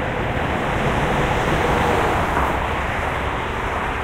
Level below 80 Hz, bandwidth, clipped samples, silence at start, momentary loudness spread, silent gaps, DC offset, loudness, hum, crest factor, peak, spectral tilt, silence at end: -30 dBFS; 16 kHz; under 0.1%; 0 s; 5 LU; none; under 0.1%; -20 LUFS; none; 14 dB; -6 dBFS; -5.5 dB/octave; 0 s